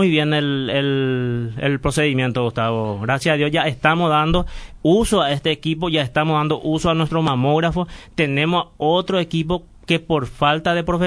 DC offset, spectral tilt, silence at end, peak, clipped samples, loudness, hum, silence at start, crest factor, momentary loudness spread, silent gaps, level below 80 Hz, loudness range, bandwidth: under 0.1%; -6 dB/octave; 0 s; 0 dBFS; under 0.1%; -19 LUFS; none; 0 s; 18 dB; 5 LU; none; -38 dBFS; 2 LU; 11 kHz